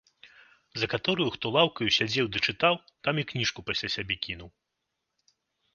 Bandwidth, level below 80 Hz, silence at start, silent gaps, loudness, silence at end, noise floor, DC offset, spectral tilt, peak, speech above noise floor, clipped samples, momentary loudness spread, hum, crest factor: 7.4 kHz; -58 dBFS; 0.25 s; none; -27 LUFS; 1.25 s; -83 dBFS; under 0.1%; -4 dB/octave; -8 dBFS; 54 dB; under 0.1%; 8 LU; none; 22 dB